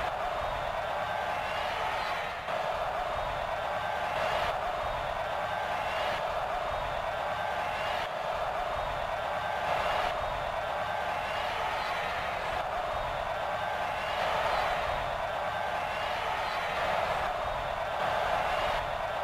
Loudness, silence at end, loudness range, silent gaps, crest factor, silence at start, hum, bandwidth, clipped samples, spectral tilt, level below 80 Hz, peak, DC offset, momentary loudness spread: -32 LUFS; 0 s; 1 LU; none; 16 dB; 0 s; none; 16 kHz; under 0.1%; -3.5 dB/octave; -50 dBFS; -16 dBFS; under 0.1%; 3 LU